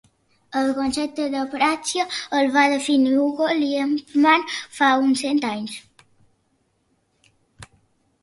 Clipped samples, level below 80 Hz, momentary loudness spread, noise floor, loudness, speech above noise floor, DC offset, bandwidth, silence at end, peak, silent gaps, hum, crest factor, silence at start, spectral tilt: under 0.1%; -62 dBFS; 9 LU; -67 dBFS; -20 LUFS; 47 dB; under 0.1%; 11.5 kHz; 0.55 s; -4 dBFS; none; none; 18 dB; 0.5 s; -3 dB/octave